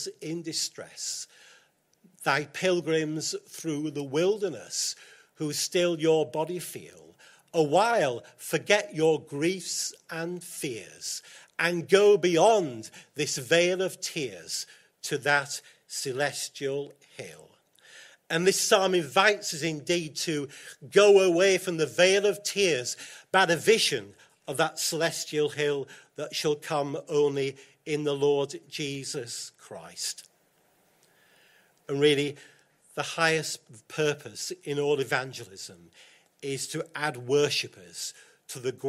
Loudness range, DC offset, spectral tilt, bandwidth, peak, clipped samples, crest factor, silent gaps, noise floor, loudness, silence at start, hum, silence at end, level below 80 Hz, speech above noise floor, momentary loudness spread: 8 LU; under 0.1%; -3.5 dB/octave; 16 kHz; -6 dBFS; under 0.1%; 22 dB; none; -67 dBFS; -27 LUFS; 0 s; none; 0 s; -76 dBFS; 39 dB; 16 LU